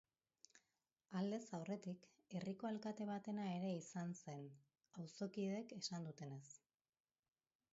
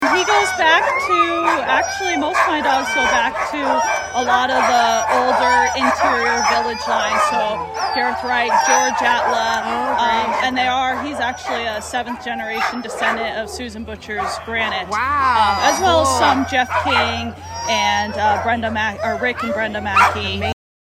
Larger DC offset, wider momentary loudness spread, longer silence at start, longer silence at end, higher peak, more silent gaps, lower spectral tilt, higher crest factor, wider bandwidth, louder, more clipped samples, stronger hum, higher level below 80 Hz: neither; first, 15 LU vs 9 LU; first, 0.55 s vs 0 s; first, 1.15 s vs 0.35 s; second, -32 dBFS vs 0 dBFS; neither; first, -6 dB/octave vs -2.5 dB/octave; about the same, 18 dB vs 18 dB; second, 7.6 kHz vs 15.5 kHz; second, -49 LUFS vs -17 LUFS; neither; neither; second, under -90 dBFS vs -46 dBFS